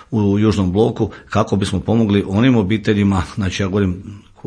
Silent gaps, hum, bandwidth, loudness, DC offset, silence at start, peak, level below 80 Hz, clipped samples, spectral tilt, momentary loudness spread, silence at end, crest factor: none; none; 10 kHz; -17 LUFS; under 0.1%; 0.1 s; -2 dBFS; -40 dBFS; under 0.1%; -7 dB/octave; 7 LU; 0.3 s; 14 dB